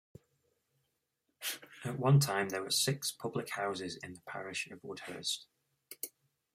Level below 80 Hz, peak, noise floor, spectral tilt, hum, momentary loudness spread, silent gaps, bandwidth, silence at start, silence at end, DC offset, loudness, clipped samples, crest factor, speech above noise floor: -76 dBFS; -16 dBFS; -83 dBFS; -4 dB/octave; none; 16 LU; none; 16 kHz; 1.4 s; 0.45 s; under 0.1%; -35 LUFS; under 0.1%; 22 dB; 48 dB